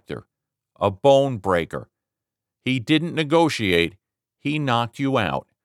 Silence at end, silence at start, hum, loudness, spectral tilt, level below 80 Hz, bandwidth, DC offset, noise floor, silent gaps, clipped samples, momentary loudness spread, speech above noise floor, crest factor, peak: 0.25 s; 0.1 s; none; -21 LUFS; -6 dB/octave; -54 dBFS; 14 kHz; under 0.1%; -86 dBFS; none; under 0.1%; 14 LU; 66 dB; 20 dB; -4 dBFS